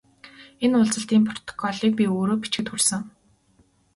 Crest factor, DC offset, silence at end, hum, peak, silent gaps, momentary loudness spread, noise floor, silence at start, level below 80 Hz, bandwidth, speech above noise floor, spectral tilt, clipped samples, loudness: 16 dB; under 0.1%; 0.85 s; none; -8 dBFS; none; 9 LU; -61 dBFS; 0.25 s; -62 dBFS; 12 kHz; 39 dB; -4 dB/octave; under 0.1%; -23 LUFS